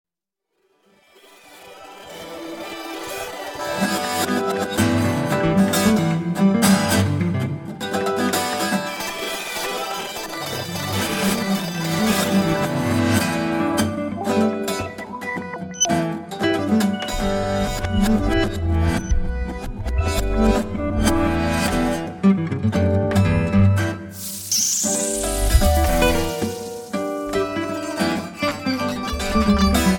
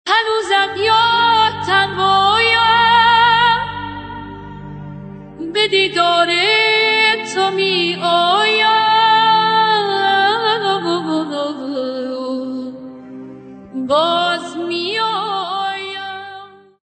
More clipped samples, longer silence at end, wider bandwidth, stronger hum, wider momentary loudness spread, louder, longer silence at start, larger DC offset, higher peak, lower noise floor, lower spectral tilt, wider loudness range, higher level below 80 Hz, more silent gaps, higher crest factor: neither; second, 0 s vs 0.35 s; first, 17.5 kHz vs 9 kHz; neither; second, 11 LU vs 19 LU; second, -21 LUFS vs -14 LUFS; first, 1.5 s vs 0.05 s; neither; about the same, -2 dBFS vs 0 dBFS; first, -81 dBFS vs -37 dBFS; about the same, -4.5 dB/octave vs -3.5 dB/octave; second, 5 LU vs 8 LU; first, -30 dBFS vs -50 dBFS; neither; about the same, 18 dB vs 14 dB